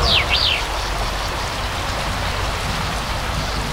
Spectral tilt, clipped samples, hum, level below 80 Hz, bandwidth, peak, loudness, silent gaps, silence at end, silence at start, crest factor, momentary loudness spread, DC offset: -3 dB/octave; under 0.1%; none; -28 dBFS; 16 kHz; -4 dBFS; -20 LUFS; none; 0 s; 0 s; 18 dB; 8 LU; under 0.1%